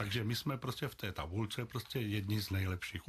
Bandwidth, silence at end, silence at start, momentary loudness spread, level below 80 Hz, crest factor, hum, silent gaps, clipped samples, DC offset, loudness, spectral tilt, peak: 15 kHz; 0 s; 0 s; 5 LU; -60 dBFS; 14 dB; none; none; under 0.1%; under 0.1%; -39 LUFS; -5.5 dB/octave; -24 dBFS